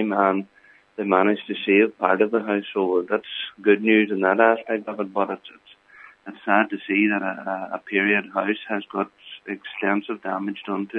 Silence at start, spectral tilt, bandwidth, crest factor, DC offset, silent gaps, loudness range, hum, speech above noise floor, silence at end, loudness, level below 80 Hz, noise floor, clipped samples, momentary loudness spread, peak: 0 s; -8 dB/octave; 4.1 kHz; 22 dB; under 0.1%; none; 4 LU; none; 27 dB; 0 s; -22 LUFS; -78 dBFS; -49 dBFS; under 0.1%; 13 LU; -2 dBFS